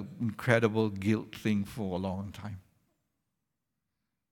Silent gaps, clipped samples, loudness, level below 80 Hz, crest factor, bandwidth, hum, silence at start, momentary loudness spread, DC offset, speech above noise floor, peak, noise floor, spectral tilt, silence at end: none; under 0.1%; -31 LUFS; -66 dBFS; 24 dB; 17.5 kHz; none; 0 s; 16 LU; under 0.1%; 55 dB; -10 dBFS; -85 dBFS; -7 dB/octave; 1.7 s